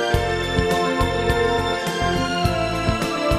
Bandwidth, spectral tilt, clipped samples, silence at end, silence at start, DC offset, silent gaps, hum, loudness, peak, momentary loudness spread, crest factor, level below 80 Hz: 15.5 kHz; -5 dB/octave; under 0.1%; 0 s; 0 s; under 0.1%; none; none; -21 LUFS; -4 dBFS; 2 LU; 16 dB; -32 dBFS